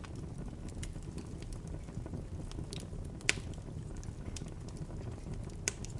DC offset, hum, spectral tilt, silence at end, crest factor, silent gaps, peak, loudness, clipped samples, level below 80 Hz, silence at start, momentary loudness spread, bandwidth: under 0.1%; none; -4 dB/octave; 0 s; 36 dB; none; -6 dBFS; -42 LUFS; under 0.1%; -48 dBFS; 0 s; 11 LU; 11.5 kHz